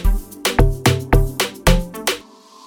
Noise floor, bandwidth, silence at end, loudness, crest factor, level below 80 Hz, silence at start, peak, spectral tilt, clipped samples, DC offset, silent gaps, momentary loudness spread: -42 dBFS; 19 kHz; 0.45 s; -19 LUFS; 16 dB; -20 dBFS; 0 s; 0 dBFS; -4.5 dB/octave; under 0.1%; under 0.1%; none; 7 LU